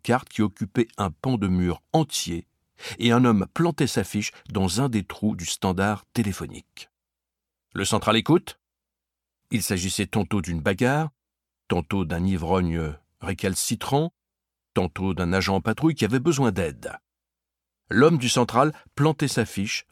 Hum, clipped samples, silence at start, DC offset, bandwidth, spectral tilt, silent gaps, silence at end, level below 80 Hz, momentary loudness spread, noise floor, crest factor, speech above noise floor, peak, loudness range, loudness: none; under 0.1%; 0.05 s; under 0.1%; 16.5 kHz; -5 dB/octave; none; 0.1 s; -48 dBFS; 10 LU; -87 dBFS; 20 dB; 63 dB; -4 dBFS; 4 LU; -24 LUFS